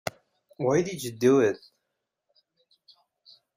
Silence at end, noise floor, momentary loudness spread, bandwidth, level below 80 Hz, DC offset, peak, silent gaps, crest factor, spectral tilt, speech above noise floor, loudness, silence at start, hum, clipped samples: 2 s; -82 dBFS; 15 LU; 15.5 kHz; -68 dBFS; under 0.1%; -10 dBFS; none; 20 dB; -5.5 dB/octave; 58 dB; -25 LUFS; 0.05 s; none; under 0.1%